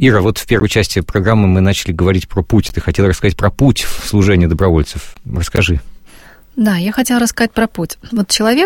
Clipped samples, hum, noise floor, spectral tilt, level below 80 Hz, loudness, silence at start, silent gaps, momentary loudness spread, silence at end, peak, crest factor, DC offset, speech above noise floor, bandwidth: under 0.1%; none; -39 dBFS; -5.5 dB/octave; -26 dBFS; -14 LUFS; 0 s; none; 8 LU; 0 s; 0 dBFS; 14 dB; under 0.1%; 27 dB; 17 kHz